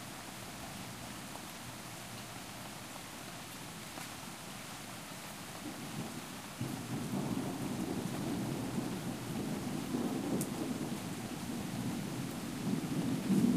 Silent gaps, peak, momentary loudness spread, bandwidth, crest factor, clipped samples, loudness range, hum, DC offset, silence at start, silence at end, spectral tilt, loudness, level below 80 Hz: none; -18 dBFS; 9 LU; 15.5 kHz; 20 dB; under 0.1%; 7 LU; none; under 0.1%; 0 s; 0 s; -5 dB/octave; -40 LUFS; -64 dBFS